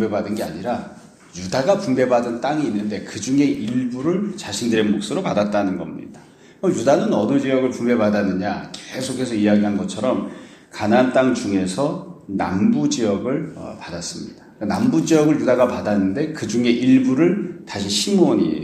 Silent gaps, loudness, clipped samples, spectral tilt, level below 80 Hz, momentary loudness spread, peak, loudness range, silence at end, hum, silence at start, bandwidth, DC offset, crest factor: none; -20 LUFS; under 0.1%; -5.5 dB/octave; -56 dBFS; 13 LU; -2 dBFS; 4 LU; 0 s; none; 0 s; 13.5 kHz; under 0.1%; 18 dB